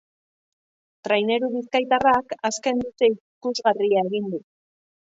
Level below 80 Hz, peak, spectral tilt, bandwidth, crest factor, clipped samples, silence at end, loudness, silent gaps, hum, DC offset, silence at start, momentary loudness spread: -60 dBFS; -6 dBFS; -4 dB/octave; 8 kHz; 18 dB; under 0.1%; 0.65 s; -22 LUFS; 3.20-3.41 s; none; under 0.1%; 1.05 s; 10 LU